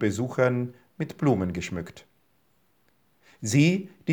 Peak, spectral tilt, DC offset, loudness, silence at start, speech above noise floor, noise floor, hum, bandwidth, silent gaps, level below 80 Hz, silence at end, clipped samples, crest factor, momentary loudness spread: -8 dBFS; -6 dB/octave; under 0.1%; -26 LUFS; 0 s; 43 dB; -68 dBFS; none; over 20 kHz; none; -64 dBFS; 0 s; under 0.1%; 20 dB; 15 LU